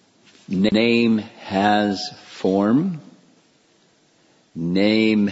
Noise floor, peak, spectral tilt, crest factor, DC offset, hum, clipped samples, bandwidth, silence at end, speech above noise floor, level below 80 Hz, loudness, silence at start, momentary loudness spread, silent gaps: -59 dBFS; -4 dBFS; -6.5 dB/octave; 16 dB; under 0.1%; none; under 0.1%; 8 kHz; 0 s; 40 dB; -60 dBFS; -20 LUFS; 0.5 s; 12 LU; none